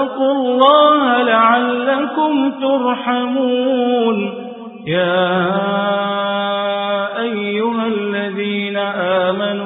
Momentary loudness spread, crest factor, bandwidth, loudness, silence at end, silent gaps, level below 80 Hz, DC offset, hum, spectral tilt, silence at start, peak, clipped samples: 8 LU; 16 dB; 4 kHz; -16 LUFS; 0 s; none; -62 dBFS; under 0.1%; none; -9.5 dB/octave; 0 s; 0 dBFS; under 0.1%